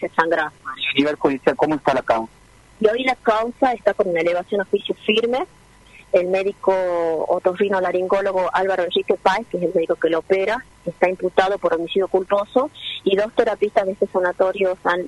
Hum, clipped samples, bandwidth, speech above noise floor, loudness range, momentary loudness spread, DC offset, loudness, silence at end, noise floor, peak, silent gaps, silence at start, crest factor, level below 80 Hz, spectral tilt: none; under 0.1%; 11.5 kHz; 28 dB; 1 LU; 4 LU; under 0.1%; -20 LUFS; 0 s; -47 dBFS; 0 dBFS; none; 0 s; 20 dB; -54 dBFS; -5.5 dB/octave